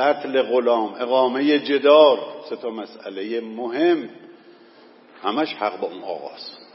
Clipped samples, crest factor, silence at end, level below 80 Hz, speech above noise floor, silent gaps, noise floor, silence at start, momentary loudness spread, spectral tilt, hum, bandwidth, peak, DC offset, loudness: under 0.1%; 18 dB; 0.2 s; -84 dBFS; 29 dB; none; -49 dBFS; 0 s; 17 LU; -8.5 dB/octave; none; 5.8 kHz; -2 dBFS; under 0.1%; -20 LUFS